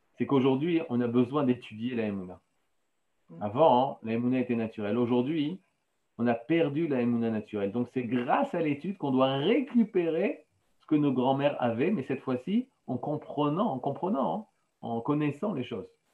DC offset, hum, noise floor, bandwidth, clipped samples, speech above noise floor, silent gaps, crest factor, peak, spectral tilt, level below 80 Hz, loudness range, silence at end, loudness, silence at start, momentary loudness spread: under 0.1%; none; -80 dBFS; 4.4 kHz; under 0.1%; 52 dB; none; 18 dB; -10 dBFS; -9 dB/octave; -78 dBFS; 3 LU; 0.25 s; -29 LUFS; 0.2 s; 9 LU